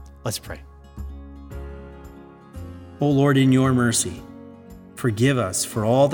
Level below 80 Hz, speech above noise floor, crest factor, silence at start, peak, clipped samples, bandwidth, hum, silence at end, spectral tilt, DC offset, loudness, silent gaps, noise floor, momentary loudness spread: -44 dBFS; 24 dB; 18 dB; 0 s; -6 dBFS; under 0.1%; 19 kHz; none; 0 s; -5.5 dB/octave; under 0.1%; -21 LUFS; none; -43 dBFS; 24 LU